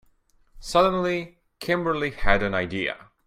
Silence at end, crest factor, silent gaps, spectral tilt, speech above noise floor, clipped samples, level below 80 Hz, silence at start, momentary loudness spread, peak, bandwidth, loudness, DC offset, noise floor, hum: 0.3 s; 20 dB; none; -5.5 dB/octave; 38 dB; under 0.1%; -38 dBFS; 0.55 s; 12 LU; -4 dBFS; 14.5 kHz; -24 LUFS; under 0.1%; -61 dBFS; none